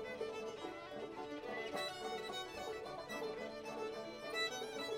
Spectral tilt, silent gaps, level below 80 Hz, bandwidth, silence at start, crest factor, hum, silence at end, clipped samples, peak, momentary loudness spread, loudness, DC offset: -3 dB/octave; none; -74 dBFS; 17 kHz; 0 s; 16 dB; none; 0 s; under 0.1%; -28 dBFS; 7 LU; -44 LUFS; under 0.1%